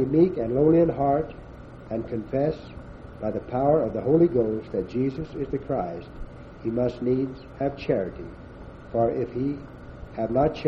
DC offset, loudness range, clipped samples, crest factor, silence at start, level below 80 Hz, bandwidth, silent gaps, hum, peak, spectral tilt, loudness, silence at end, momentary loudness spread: under 0.1%; 4 LU; under 0.1%; 18 dB; 0 s; -46 dBFS; 6.2 kHz; none; none; -8 dBFS; -10 dB/octave; -25 LUFS; 0 s; 22 LU